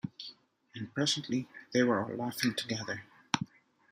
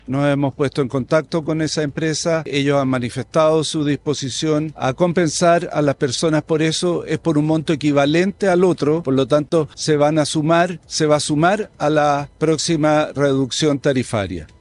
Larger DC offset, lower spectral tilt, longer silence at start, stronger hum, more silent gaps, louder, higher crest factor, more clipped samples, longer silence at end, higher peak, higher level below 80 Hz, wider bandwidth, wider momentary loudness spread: neither; about the same, -4 dB/octave vs -5 dB/octave; about the same, 0.05 s vs 0.1 s; neither; neither; second, -33 LUFS vs -18 LUFS; first, 28 dB vs 14 dB; neither; first, 0.45 s vs 0.15 s; about the same, -6 dBFS vs -4 dBFS; second, -76 dBFS vs -50 dBFS; first, 15.5 kHz vs 11.5 kHz; first, 15 LU vs 5 LU